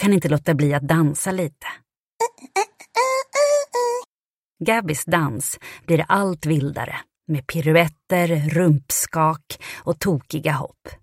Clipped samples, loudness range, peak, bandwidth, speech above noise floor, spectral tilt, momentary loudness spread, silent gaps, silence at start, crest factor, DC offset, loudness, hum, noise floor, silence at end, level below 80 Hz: under 0.1%; 2 LU; -2 dBFS; 16.5 kHz; over 69 dB; -5.5 dB/octave; 11 LU; 1.97-2.19 s, 4.07-4.20 s, 4.26-4.56 s; 0 s; 18 dB; under 0.1%; -21 LUFS; none; under -90 dBFS; 0.05 s; -54 dBFS